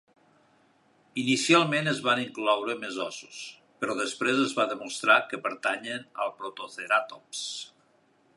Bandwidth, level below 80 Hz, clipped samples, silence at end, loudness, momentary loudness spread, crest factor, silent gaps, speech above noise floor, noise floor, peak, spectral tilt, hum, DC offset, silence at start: 11.5 kHz; -82 dBFS; under 0.1%; 0.7 s; -27 LUFS; 16 LU; 22 dB; none; 37 dB; -65 dBFS; -6 dBFS; -3.5 dB/octave; none; under 0.1%; 1.15 s